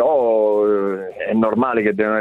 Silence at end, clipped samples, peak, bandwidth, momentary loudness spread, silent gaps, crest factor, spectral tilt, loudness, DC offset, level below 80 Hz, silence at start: 0 s; under 0.1%; -4 dBFS; 4.1 kHz; 6 LU; none; 12 dB; -8.5 dB/octave; -18 LUFS; under 0.1%; -58 dBFS; 0 s